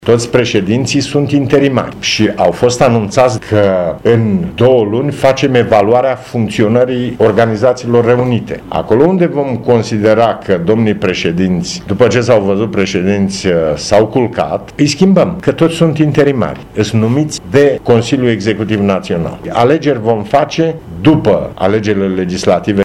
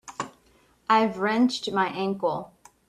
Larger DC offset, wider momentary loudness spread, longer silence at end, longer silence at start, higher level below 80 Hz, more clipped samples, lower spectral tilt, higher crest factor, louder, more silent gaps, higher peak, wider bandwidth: neither; second, 5 LU vs 15 LU; second, 0 s vs 0.4 s; about the same, 0 s vs 0.05 s; first, -40 dBFS vs -66 dBFS; first, 0.3% vs under 0.1%; about the same, -6 dB/octave vs -5 dB/octave; second, 10 dB vs 18 dB; first, -12 LUFS vs -25 LUFS; neither; first, 0 dBFS vs -8 dBFS; about the same, 12.5 kHz vs 12 kHz